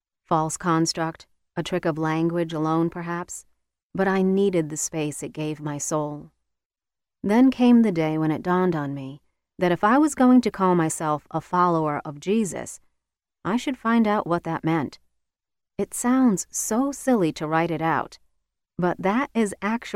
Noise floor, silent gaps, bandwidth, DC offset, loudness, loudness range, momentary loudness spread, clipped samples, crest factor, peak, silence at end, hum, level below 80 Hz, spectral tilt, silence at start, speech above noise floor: -89 dBFS; 3.83-3.90 s, 6.65-6.70 s; 15.5 kHz; under 0.1%; -23 LUFS; 5 LU; 14 LU; under 0.1%; 16 dB; -8 dBFS; 0 s; none; -58 dBFS; -5.5 dB/octave; 0.3 s; 67 dB